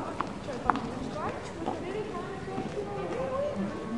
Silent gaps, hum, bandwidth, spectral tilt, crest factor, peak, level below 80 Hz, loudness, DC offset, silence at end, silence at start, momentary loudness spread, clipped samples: none; none; 11.5 kHz; -6 dB/octave; 30 dB; -4 dBFS; -52 dBFS; -34 LUFS; 0.2%; 0 s; 0 s; 6 LU; under 0.1%